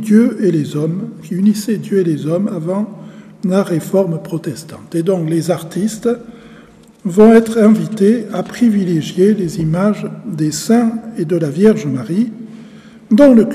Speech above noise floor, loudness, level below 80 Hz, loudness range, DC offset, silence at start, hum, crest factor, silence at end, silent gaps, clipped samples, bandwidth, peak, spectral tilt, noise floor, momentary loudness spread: 28 dB; -15 LUFS; -50 dBFS; 6 LU; under 0.1%; 0 s; none; 14 dB; 0 s; none; under 0.1%; 14.5 kHz; 0 dBFS; -7 dB/octave; -42 dBFS; 13 LU